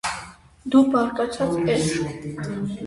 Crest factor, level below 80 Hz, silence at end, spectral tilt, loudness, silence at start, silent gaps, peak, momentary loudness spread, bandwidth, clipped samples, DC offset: 18 dB; -50 dBFS; 0 s; -5.5 dB/octave; -22 LUFS; 0.05 s; none; -6 dBFS; 13 LU; 11.5 kHz; under 0.1%; under 0.1%